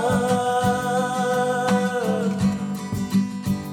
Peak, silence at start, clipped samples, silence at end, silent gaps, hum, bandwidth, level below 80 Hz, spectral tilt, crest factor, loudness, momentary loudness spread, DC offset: -8 dBFS; 0 s; under 0.1%; 0 s; none; none; 17 kHz; -50 dBFS; -6 dB/octave; 14 dB; -22 LUFS; 6 LU; under 0.1%